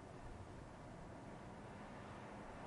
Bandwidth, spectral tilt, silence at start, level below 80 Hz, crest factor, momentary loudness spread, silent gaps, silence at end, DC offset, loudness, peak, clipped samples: 11 kHz; -6 dB/octave; 0 s; -64 dBFS; 12 dB; 2 LU; none; 0 s; under 0.1%; -55 LUFS; -42 dBFS; under 0.1%